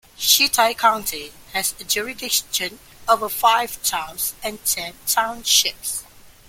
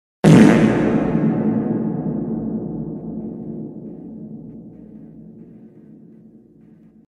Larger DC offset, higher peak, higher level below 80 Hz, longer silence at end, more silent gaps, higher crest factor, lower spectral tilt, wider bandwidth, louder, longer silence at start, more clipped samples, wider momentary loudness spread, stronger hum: neither; about the same, -2 dBFS vs 0 dBFS; second, -54 dBFS vs -46 dBFS; second, 0.25 s vs 1.65 s; neither; about the same, 20 dB vs 20 dB; second, 0.5 dB/octave vs -7.5 dB/octave; first, 17 kHz vs 11.5 kHz; about the same, -19 LUFS vs -17 LUFS; about the same, 0.2 s vs 0.25 s; neither; second, 11 LU vs 27 LU; neither